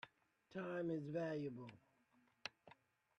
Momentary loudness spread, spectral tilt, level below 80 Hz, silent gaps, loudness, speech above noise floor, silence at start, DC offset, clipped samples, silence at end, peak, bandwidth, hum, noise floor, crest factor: 17 LU; -7 dB/octave; -86 dBFS; none; -48 LUFS; 32 dB; 0.05 s; under 0.1%; under 0.1%; 0.45 s; -28 dBFS; 9.4 kHz; none; -78 dBFS; 20 dB